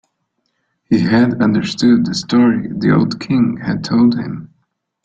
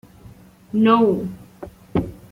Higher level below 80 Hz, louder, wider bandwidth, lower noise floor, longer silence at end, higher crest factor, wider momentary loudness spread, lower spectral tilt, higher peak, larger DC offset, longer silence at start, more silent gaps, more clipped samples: about the same, -50 dBFS vs -48 dBFS; first, -15 LUFS vs -19 LUFS; second, 8 kHz vs 9.4 kHz; first, -69 dBFS vs -45 dBFS; first, 0.6 s vs 0.15 s; about the same, 14 dB vs 18 dB; second, 6 LU vs 24 LU; second, -6.5 dB/octave vs -8 dB/octave; about the same, -2 dBFS vs -4 dBFS; neither; first, 0.9 s vs 0.25 s; neither; neither